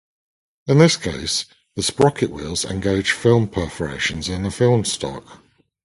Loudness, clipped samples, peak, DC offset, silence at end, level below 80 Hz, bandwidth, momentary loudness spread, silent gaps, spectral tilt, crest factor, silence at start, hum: -19 LUFS; under 0.1%; 0 dBFS; under 0.1%; 0.5 s; -42 dBFS; 11.5 kHz; 11 LU; none; -5 dB/octave; 20 dB; 0.65 s; none